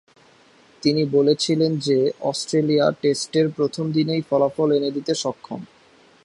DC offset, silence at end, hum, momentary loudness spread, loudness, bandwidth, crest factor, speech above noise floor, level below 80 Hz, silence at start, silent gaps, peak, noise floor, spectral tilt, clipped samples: under 0.1%; 0.6 s; none; 7 LU; -21 LUFS; 11.5 kHz; 16 dB; 33 dB; -66 dBFS; 0.85 s; none; -6 dBFS; -54 dBFS; -5.5 dB/octave; under 0.1%